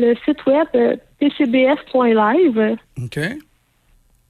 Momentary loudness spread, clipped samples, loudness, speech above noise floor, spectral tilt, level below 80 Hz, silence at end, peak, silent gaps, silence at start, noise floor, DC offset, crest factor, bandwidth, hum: 11 LU; under 0.1%; -17 LUFS; 41 dB; -7 dB/octave; -54 dBFS; 0.9 s; -4 dBFS; none; 0 s; -57 dBFS; under 0.1%; 12 dB; 12.5 kHz; none